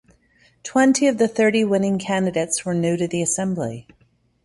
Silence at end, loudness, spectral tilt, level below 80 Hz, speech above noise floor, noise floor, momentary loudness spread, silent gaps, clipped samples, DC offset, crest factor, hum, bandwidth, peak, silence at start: 0.65 s; -20 LUFS; -4.5 dB/octave; -58 dBFS; 41 dB; -61 dBFS; 9 LU; none; under 0.1%; under 0.1%; 16 dB; none; 11.5 kHz; -6 dBFS; 0.65 s